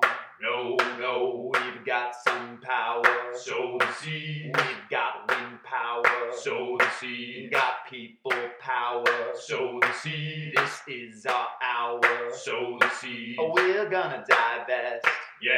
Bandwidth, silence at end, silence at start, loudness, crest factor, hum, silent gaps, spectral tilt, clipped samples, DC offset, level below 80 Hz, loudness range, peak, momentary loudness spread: 17 kHz; 0 s; 0 s; -27 LUFS; 22 dB; none; none; -4 dB/octave; under 0.1%; under 0.1%; -84 dBFS; 2 LU; -4 dBFS; 9 LU